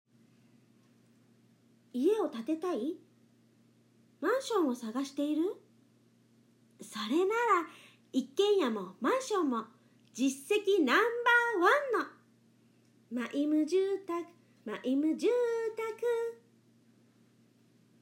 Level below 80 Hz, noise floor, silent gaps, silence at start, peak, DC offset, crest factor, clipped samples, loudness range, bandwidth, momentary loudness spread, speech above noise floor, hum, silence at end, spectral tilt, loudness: under -90 dBFS; -66 dBFS; none; 1.95 s; -14 dBFS; under 0.1%; 20 dB; under 0.1%; 6 LU; 16 kHz; 15 LU; 35 dB; none; 1.7 s; -3.5 dB/octave; -31 LUFS